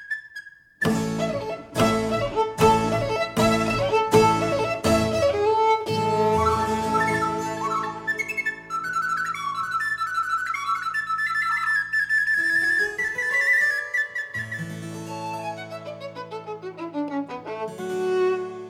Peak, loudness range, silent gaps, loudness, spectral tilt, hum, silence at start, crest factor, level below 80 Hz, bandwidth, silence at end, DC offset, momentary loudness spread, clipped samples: -4 dBFS; 9 LU; none; -23 LUFS; -5 dB/octave; none; 0 s; 20 dB; -48 dBFS; 16.5 kHz; 0 s; under 0.1%; 13 LU; under 0.1%